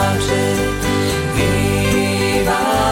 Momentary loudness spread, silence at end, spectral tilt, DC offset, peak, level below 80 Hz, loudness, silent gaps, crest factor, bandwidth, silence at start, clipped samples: 2 LU; 0 s; -5 dB/octave; under 0.1%; -6 dBFS; -30 dBFS; -16 LUFS; none; 12 dB; 17 kHz; 0 s; under 0.1%